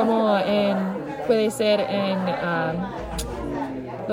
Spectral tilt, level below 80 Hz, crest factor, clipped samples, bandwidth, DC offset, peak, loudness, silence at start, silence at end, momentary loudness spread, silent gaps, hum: -5.5 dB/octave; -44 dBFS; 14 dB; under 0.1%; 16 kHz; under 0.1%; -8 dBFS; -24 LUFS; 0 s; 0 s; 10 LU; none; none